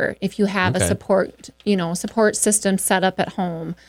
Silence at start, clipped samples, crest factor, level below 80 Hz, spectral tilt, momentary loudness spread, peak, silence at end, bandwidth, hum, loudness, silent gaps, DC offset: 0 s; under 0.1%; 16 dB; -50 dBFS; -4 dB/octave; 8 LU; -4 dBFS; 0.15 s; 16.5 kHz; none; -20 LUFS; none; under 0.1%